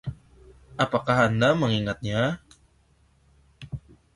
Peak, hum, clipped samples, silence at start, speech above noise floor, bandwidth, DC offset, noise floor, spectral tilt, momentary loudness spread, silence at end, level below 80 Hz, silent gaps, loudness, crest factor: -8 dBFS; none; under 0.1%; 0.05 s; 39 dB; 11.5 kHz; under 0.1%; -62 dBFS; -6 dB/octave; 19 LU; 0.4 s; -52 dBFS; none; -24 LUFS; 20 dB